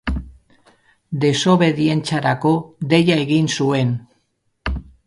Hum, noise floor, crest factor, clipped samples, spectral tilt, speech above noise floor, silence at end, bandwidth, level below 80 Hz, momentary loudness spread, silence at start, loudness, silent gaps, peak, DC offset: none; -67 dBFS; 18 dB; under 0.1%; -6 dB/octave; 50 dB; 0.25 s; 11.5 kHz; -36 dBFS; 13 LU; 0.05 s; -18 LUFS; none; -2 dBFS; under 0.1%